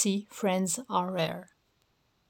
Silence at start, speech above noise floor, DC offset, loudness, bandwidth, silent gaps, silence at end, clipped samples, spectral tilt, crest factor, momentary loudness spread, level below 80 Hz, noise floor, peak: 0 s; 41 dB; under 0.1%; -30 LUFS; 17.5 kHz; none; 0.85 s; under 0.1%; -4 dB/octave; 18 dB; 4 LU; -76 dBFS; -72 dBFS; -14 dBFS